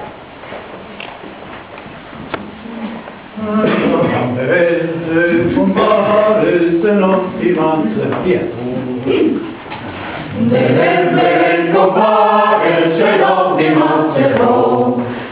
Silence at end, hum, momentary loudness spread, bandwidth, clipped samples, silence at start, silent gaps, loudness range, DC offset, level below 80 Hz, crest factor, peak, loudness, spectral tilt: 0 s; none; 18 LU; 4 kHz; under 0.1%; 0 s; none; 8 LU; under 0.1%; -46 dBFS; 14 dB; 0 dBFS; -13 LUFS; -10.5 dB/octave